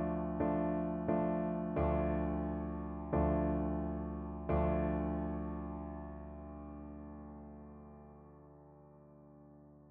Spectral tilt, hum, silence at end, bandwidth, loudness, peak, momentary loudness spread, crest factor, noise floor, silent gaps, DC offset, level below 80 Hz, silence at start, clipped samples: -10 dB/octave; none; 0 s; 3.6 kHz; -37 LUFS; -20 dBFS; 19 LU; 18 dB; -59 dBFS; none; under 0.1%; -46 dBFS; 0 s; under 0.1%